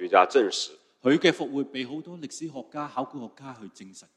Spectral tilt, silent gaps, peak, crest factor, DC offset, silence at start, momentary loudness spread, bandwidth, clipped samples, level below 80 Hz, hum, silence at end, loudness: -4 dB/octave; none; -4 dBFS; 22 dB; under 0.1%; 0 s; 22 LU; 11.5 kHz; under 0.1%; -76 dBFS; none; 0.15 s; -26 LUFS